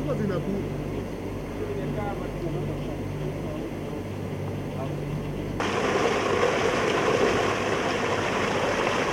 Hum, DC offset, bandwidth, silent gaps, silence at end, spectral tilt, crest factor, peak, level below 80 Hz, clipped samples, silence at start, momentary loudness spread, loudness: none; under 0.1%; 16.5 kHz; none; 0 s; -5.5 dB/octave; 18 dB; -8 dBFS; -44 dBFS; under 0.1%; 0 s; 9 LU; -27 LUFS